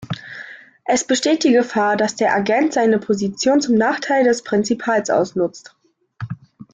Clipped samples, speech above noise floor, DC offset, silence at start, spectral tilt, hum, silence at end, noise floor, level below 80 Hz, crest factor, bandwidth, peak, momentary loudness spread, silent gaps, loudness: under 0.1%; 22 dB; under 0.1%; 0 s; -4.5 dB/octave; none; 0.1 s; -39 dBFS; -60 dBFS; 14 dB; 9.6 kHz; -4 dBFS; 16 LU; none; -17 LUFS